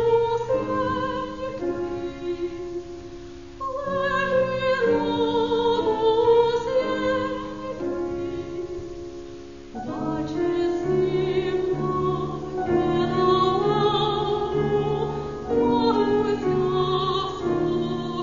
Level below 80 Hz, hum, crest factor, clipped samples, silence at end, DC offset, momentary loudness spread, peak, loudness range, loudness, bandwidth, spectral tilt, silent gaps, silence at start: -48 dBFS; none; 16 dB; under 0.1%; 0 s; 0.4%; 13 LU; -8 dBFS; 7 LU; -24 LUFS; 7.4 kHz; -6.5 dB/octave; none; 0 s